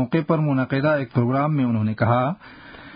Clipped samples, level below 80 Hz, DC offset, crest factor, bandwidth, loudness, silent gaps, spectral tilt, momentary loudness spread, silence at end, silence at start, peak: under 0.1%; -54 dBFS; under 0.1%; 16 dB; 5.2 kHz; -21 LUFS; none; -13 dB/octave; 5 LU; 0 s; 0 s; -6 dBFS